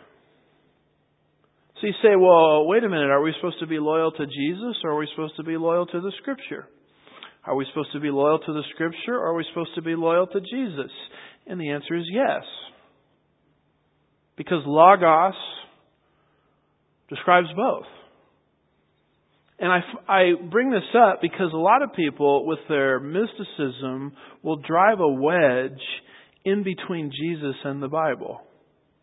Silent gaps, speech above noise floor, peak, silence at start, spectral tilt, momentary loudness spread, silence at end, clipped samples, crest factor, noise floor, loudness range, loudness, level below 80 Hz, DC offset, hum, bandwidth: none; 45 dB; -2 dBFS; 1.75 s; -10.5 dB/octave; 15 LU; 0.6 s; under 0.1%; 22 dB; -67 dBFS; 8 LU; -22 LUFS; -74 dBFS; under 0.1%; none; 4 kHz